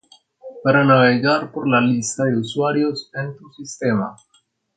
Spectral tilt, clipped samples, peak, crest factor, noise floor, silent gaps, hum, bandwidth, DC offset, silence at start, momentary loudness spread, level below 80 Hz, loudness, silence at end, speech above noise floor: -5.5 dB/octave; under 0.1%; 0 dBFS; 18 dB; -62 dBFS; none; none; 9.4 kHz; under 0.1%; 0.45 s; 16 LU; -62 dBFS; -18 LUFS; 0.6 s; 44 dB